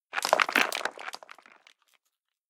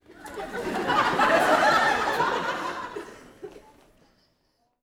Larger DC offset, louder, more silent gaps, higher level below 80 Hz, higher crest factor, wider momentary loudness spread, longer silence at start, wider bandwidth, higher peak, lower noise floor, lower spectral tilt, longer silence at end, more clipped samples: neither; second, -26 LUFS vs -23 LUFS; neither; second, -88 dBFS vs -56 dBFS; first, 28 dB vs 18 dB; second, 18 LU vs 25 LU; about the same, 0.15 s vs 0.1 s; second, 17.5 kHz vs over 20 kHz; first, -2 dBFS vs -8 dBFS; first, -82 dBFS vs -71 dBFS; second, 0 dB/octave vs -3.5 dB/octave; about the same, 1.35 s vs 1.25 s; neither